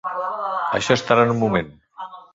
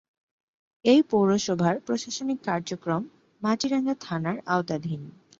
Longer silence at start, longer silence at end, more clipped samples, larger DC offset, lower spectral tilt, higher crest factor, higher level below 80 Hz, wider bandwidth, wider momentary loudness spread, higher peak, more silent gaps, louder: second, 0.05 s vs 0.85 s; second, 0.15 s vs 0.3 s; neither; neither; about the same, -5 dB/octave vs -5.5 dB/octave; about the same, 20 dB vs 20 dB; first, -52 dBFS vs -66 dBFS; about the same, 7.8 kHz vs 7.8 kHz; first, 20 LU vs 10 LU; first, 0 dBFS vs -6 dBFS; neither; first, -20 LUFS vs -26 LUFS